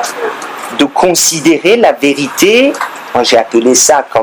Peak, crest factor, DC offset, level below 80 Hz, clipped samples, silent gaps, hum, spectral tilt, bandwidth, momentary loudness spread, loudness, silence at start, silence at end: 0 dBFS; 10 dB; under 0.1%; -48 dBFS; 0.4%; none; none; -2 dB/octave; over 20 kHz; 12 LU; -9 LUFS; 0 s; 0 s